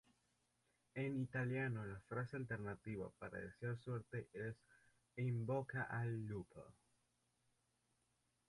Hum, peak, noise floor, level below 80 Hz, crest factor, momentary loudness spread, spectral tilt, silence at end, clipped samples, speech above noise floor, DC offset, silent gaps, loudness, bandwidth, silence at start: 60 Hz at -70 dBFS; -32 dBFS; -84 dBFS; -74 dBFS; 16 dB; 10 LU; -8.5 dB/octave; 1.75 s; under 0.1%; 38 dB; under 0.1%; none; -46 LUFS; 11.5 kHz; 0.95 s